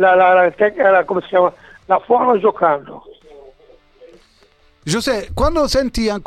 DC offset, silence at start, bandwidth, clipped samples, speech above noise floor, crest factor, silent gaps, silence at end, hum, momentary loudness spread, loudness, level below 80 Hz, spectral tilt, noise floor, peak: under 0.1%; 0 s; 13.5 kHz; under 0.1%; 38 dB; 16 dB; none; 0.05 s; none; 8 LU; -15 LUFS; -34 dBFS; -4.5 dB/octave; -53 dBFS; 0 dBFS